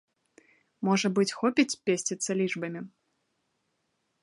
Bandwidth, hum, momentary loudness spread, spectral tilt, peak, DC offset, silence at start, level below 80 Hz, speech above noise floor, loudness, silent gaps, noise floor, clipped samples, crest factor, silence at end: 11.5 kHz; none; 11 LU; -4 dB/octave; -8 dBFS; under 0.1%; 0.8 s; -80 dBFS; 50 dB; -28 LUFS; none; -77 dBFS; under 0.1%; 22 dB; 1.35 s